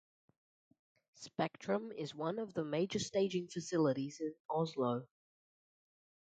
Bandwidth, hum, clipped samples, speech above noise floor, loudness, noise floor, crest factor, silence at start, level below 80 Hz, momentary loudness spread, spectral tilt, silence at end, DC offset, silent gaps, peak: 9 kHz; none; under 0.1%; over 52 dB; -38 LUFS; under -90 dBFS; 18 dB; 1.2 s; -78 dBFS; 8 LU; -5.5 dB/octave; 1.2 s; under 0.1%; 4.40-4.49 s; -20 dBFS